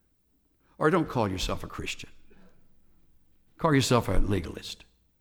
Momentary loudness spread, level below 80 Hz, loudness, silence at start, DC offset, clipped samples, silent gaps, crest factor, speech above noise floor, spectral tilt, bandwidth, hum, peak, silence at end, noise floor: 16 LU; -36 dBFS; -28 LUFS; 0.8 s; under 0.1%; under 0.1%; none; 22 dB; 43 dB; -5.5 dB/octave; 17.5 kHz; none; -8 dBFS; 0.45 s; -69 dBFS